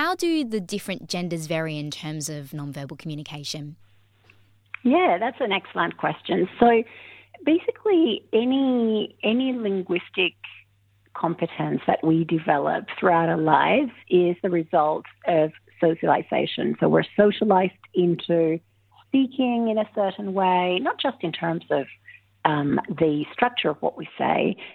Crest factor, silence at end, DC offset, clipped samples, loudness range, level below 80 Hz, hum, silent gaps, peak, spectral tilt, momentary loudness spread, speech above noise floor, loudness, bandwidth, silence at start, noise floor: 22 dB; 0 s; under 0.1%; under 0.1%; 6 LU; -64 dBFS; none; none; -2 dBFS; -6 dB/octave; 12 LU; 39 dB; -23 LUFS; 15.5 kHz; 0 s; -62 dBFS